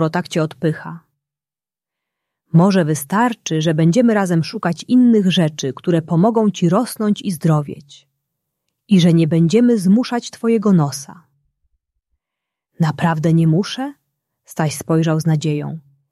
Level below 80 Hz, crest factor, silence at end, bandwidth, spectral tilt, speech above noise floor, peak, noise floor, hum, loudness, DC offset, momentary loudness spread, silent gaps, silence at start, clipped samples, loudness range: -60 dBFS; 16 dB; 0.35 s; 13 kHz; -6.5 dB/octave; over 74 dB; -2 dBFS; under -90 dBFS; none; -16 LUFS; under 0.1%; 11 LU; none; 0 s; under 0.1%; 5 LU